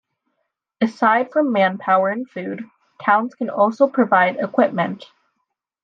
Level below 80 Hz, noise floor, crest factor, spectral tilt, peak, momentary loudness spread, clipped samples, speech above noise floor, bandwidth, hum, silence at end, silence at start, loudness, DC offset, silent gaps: -74 dBFS; -76 dBFS; 18 dB; -7 dB/octave; -2 dBFS; 13 LU; under 0.1%; 57 dB; 7.4 kHz; none; 0.8 s; 0.8 s; -19 LUFS; under 0.1%; none